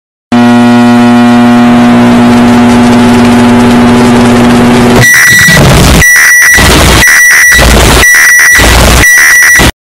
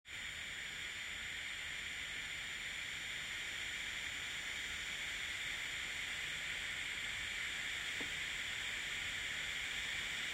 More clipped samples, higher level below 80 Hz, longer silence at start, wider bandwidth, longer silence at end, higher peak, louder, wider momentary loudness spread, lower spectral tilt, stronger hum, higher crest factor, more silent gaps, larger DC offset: first, 6% vs under 0.1%; first, -14 dBFS vs -64 dBFS; first, 0.3 s vs 0.05 s; about the same, 17 kHz vs 16 kHz; about the same, 0.1 s vs 0 s; first, 0 dBFS vs -30 dBFS; first, -1 LUFS vs -41 LUFS; about the same, 4 LU vs 3 LU; first, -3.5 dB/octave vs 0 dB/octave; neither; second, 2 dB vs 14 dB; neither; first, 1% vs under 0.1%